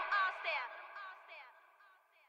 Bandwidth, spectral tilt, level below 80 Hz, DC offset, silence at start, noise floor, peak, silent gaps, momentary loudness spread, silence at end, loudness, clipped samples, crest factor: 15 kHz; 1 dB/octave; under -90 dBFS; under 0.1%; 0 s; -67 dBFS; -24 dBFS; none; 20 LU; 0.4 s; -39 LUFS; under 0.1%; 18 dB